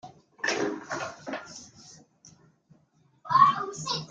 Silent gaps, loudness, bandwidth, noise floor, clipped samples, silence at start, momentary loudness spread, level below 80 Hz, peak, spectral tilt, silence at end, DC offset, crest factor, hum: none; -27 LUFS; 9.2 kHz; -65 dBFS; under 0.1%; 0.05 s; 22 LU; -72 dBFS; -6 dBFS; -3 dB/octave; 0.05 s; under 0.1%; 24 dB; none